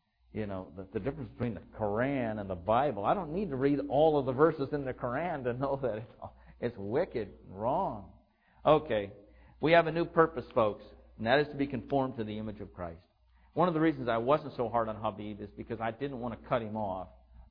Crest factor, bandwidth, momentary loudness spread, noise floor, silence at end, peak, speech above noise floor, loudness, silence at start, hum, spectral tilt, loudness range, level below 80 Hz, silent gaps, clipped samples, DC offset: 22 dB; 5.2 kHz; 15 LU; -64 dBFS; 0.05 s; -10 dBFS; 33 dB; -32 LUFS; 0.35 s; none; -10 dB/octave; 5 LU; -56 dBFS; none; under 0.1%; under 0.1%